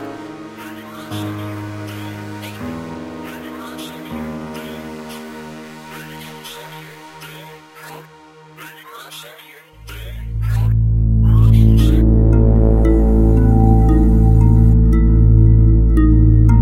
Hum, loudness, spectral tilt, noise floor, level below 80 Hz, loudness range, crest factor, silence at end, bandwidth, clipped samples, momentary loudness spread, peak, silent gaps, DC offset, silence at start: none; -13 LUFS; -8.5 dB/octave; -43 dBFS; -18 dBFS; 22 LU; 12 dB; 0 s; 13 kHz; under 0.1%; 23 LU; -2 dBFS; none; under 0.1%; 0 s